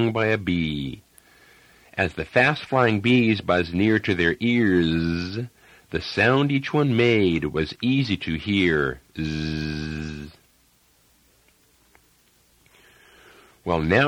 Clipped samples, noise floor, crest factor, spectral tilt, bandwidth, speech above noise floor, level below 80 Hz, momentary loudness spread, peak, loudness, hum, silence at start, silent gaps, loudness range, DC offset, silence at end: under 0.1%; -61 dBFS; 20 dB; -7 dB/octave; 13 kHz; 39 dB; -46 dBFS; 13 LU; -4 dBFS; -22 LUFS; none; 0 s; none; 12 LU; under 0.1%; 0 s